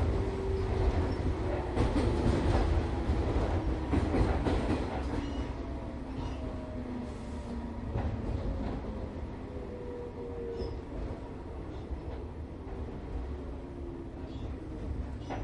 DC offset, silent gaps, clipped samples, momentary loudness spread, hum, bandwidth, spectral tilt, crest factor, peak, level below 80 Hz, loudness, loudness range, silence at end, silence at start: under 0.1%; none; under 0.1%; 12 LU; none; 10.5 kHz; -8 dB/octave; 18 dB; -14 dBFS; -36 dBFS; -35 LUFS; 10 LU; 0 s; 0 s